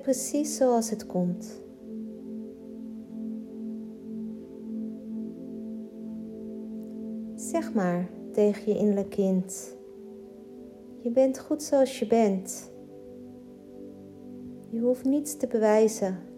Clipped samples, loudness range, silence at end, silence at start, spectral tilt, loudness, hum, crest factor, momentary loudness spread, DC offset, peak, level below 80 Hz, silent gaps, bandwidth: under 0.1%; 10 LU; 0 s; 0 s; -6 dB/octave; -29 LUFS; none; 20 dB; 21 LU; under 0.1%; -10 dBFS; -68 dBFS; none; 16 kHz